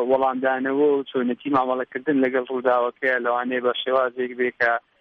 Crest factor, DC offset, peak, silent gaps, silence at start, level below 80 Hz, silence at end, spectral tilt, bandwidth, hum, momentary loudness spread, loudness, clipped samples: 14 dB; under 0.1%; -8 dBFS; none; 0 s; -68 dBFS; 0.2 s; -7 dB/octave; 5.8 kHz; none; 5 LU; -22 LUFS; under 0.1%